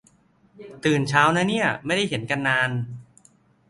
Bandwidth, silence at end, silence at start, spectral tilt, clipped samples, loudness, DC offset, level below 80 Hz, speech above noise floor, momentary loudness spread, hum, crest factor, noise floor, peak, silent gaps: 11.5 kHz; 0.7 s; 0.6 s; -5 dB/octave; under 0.1%; -22 LUFS; under 0.1%; -60 dBFS; 37 dB; 11 LU; none; 22 dB; -59 dBFS; -2 dBFS; none